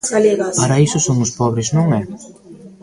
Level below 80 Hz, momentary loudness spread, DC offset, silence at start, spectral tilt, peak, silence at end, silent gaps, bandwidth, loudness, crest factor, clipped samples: -48 dBFS; 7 LU; under 0.1%; 0.05 s; -5.5 dB/octave; -2 dBFS; 0.1 s; none; 11.5 kHz; -16 LUFS; 16 dB; under 0.1%